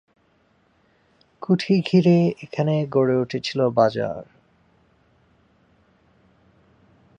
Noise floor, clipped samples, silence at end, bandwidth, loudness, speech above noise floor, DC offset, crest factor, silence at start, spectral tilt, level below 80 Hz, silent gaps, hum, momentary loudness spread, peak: -62 dBFS; under 0.1%; 2.95 s; 7.4 kHz; -21 LUFS; 43 dB; under 0.1%; 18 dB; 1.4 s; -7.5 dB/octave; -64 dBFS; none; none; 11 LU; -6 dBFS